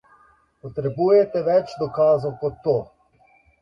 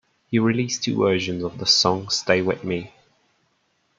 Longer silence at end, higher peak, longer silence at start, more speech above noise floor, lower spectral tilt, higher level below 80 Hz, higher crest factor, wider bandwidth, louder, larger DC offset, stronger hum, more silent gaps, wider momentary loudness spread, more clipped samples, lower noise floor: second, 0.8 s vs 1.1 s; second, -6 dBFS vs -2 dBFS; first, 0.65 s vs 0.3 s; second, 38 dB vs 46 dB; first, -8.5 dB/octave vs -4 dB/octave; first, -56 dBFS vs -62 dBFS; about the same, 16 dB vs 20 dB; second, 7.2 kHz vs 11 kHz; about the same, -21 LUFS vs -21 LUFS; neither; neither; neither; about the same, 11 LU vs 10 LU; neither; second, -58 dBFS vs -68 dBFS